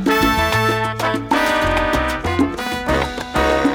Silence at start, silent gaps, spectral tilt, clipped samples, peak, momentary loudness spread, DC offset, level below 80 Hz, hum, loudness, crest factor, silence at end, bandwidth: 0 s; none; -5 dB/octave; under 0.1%; -4 dBFS; 5 LU; under 0.1%; -30 dBFS; none; -18 LUFS; 14 dB; 0 s; over 20 kHz